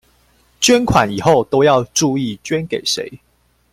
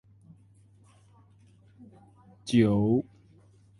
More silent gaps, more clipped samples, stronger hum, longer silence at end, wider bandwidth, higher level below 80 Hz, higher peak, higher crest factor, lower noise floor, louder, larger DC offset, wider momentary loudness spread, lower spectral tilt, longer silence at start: neither; neither; neither; second, 0.55 s vs 0.8 s; first, 16 kHz vs 11.5 kHz; first, -42 dBFS vs -58 dBFS; first, 0 dBFS vs -8 dBFS; second, 16 dB vs 22 dB; about the same, -55 dBFS vs -58 dBFS; first, -15 LUFS vs -25 LUFS; neither; second, 9 LU vs 21 LU; second, -4 dB/octave vs -7.5 dB/octave; second, 0.6 s vs 2.45 s